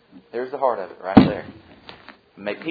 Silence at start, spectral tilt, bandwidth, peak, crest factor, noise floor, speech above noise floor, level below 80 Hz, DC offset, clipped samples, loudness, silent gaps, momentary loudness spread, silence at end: 0.15 s; -9.5 dB/octave; 5.2 kHz; 0 dBFS; 22 dB; -45 dBFS; 25 dB; -48 dBFS; under 0.1%; 0.1%; -21 LUFS; none; 20 LU; 0 s